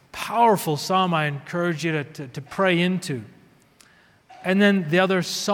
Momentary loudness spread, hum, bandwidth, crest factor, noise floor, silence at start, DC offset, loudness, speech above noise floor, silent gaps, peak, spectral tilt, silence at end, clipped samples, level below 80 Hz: 13 LU; none; 19 kHz; 18 dB; -55 dBFS; 0.15 s; under 0.1%; -22 LUFS; 33 dB; none; -4 dBFS; -5 dB/octave; 0 s; under 0.1%; -66 dBFS